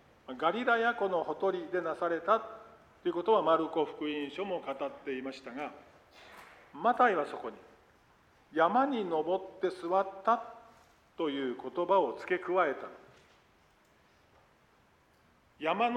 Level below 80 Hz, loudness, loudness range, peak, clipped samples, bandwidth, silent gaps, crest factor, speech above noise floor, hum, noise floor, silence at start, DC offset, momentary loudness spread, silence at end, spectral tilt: -74 dBFS; -32 LUFS; 6 LU; -12 dBFS; under 0.1%; 10.5 kHz; none; 20 dB; 35 dB; none; -66 dBFS; 0.3 s; under 0.1%; 16 LU; 0 s; -6 dB/octave